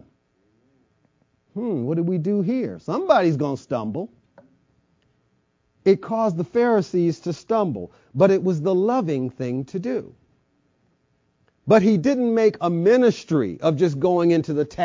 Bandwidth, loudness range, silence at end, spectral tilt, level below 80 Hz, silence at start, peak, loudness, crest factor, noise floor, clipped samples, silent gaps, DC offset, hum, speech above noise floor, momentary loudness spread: 7.6 kHz; 6 LU; 0 s; -7.5 dB/octave; -60 dBFS; 1.55 s; -2 dBFS; -21 LUFS; 20 dB; -67 dBFS; under 0.1%; none; under 0.1%; none; 47 dB; 10 LU